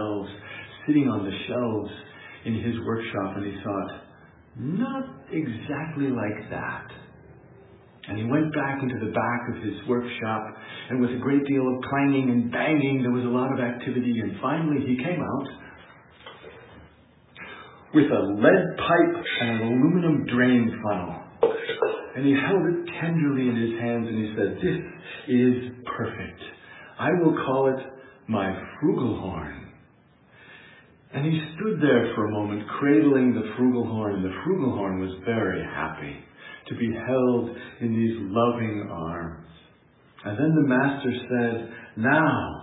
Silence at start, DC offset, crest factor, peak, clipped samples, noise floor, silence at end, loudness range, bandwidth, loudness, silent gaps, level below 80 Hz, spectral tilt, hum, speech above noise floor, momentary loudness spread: 0 s; under 0.1%; 20 dB; -4 dBFS; under 0.1%; -57 dBFS; 0 s; 8 LU; 4 kHz; -25 LUFS; none; -62 dBFS; -11.5 dB/octave; none; 33 dB; 17 LU